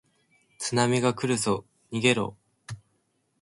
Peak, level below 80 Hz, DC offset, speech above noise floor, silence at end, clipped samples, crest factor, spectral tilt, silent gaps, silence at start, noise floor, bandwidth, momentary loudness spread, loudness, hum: -6 dBFS; -62 dBFS; under 0.1%; 47 dB; 0.65 s; under 0.1%; 22 dB; -4.5 dB/octave; none; 0.6 s; -72 dBFS; 11.5 kHz; 20 LU; -26 LUFS; none